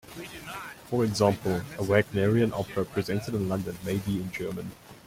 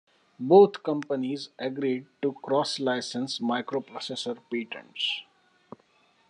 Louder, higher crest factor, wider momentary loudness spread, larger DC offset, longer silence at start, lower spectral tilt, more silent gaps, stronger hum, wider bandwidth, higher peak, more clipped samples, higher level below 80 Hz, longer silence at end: about the same, -28 LUFS vs -27 LUFS; about the same, 20 dB vs 22 dB; about the same, 14 LU vs 14 LU; neither; second, 0.05 s vs 0.4 s; first, -6.5 dB/octave vs -5 dB/octave; neither; neither; first, 16.5 kHz vs 10.5 kHz; about the same, -8 dBFS vs -6 dBFS; neither; first, -56 dBFS vs -84 dBFS; second, 0.05 s vs 1.05 s